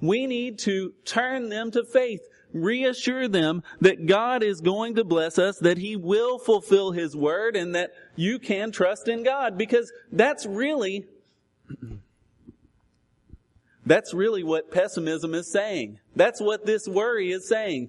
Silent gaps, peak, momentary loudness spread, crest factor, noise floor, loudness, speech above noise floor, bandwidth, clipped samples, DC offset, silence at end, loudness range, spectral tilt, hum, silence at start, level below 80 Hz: none; -4 dBFS; 8 LU; 20 dB; -66 dBFS; -24 LUFS; 42 dB; 11.5 kHz; under 0.1%; under 0.1%; 0 s; 6 LU; -5 dB/octave; none; 0 s; -64 dBFS